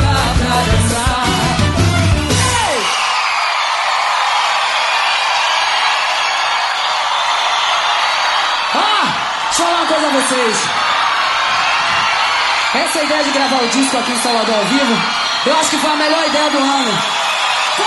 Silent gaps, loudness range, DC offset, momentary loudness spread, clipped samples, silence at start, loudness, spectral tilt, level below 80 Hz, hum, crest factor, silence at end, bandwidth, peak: none; 1 LU; under 0.1%; 2 LU; under 0.1%; 0 s; -13 LUFS; -3 dB/octave; -30 dBFS; none; 14 dB; 0 s; 12 kHz; 0 dBFS